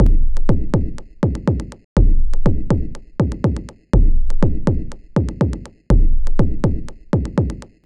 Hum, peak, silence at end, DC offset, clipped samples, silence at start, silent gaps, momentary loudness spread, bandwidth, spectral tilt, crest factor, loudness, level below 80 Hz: none; 0 dBFS; 0.25 s; under 0.1%; under 0.1%; 0 s; 1.84-1.96 s; 6 LU; 6.8 kHz; -9 dB/octave; 14 dB; -21 LUFS; -16 dBFS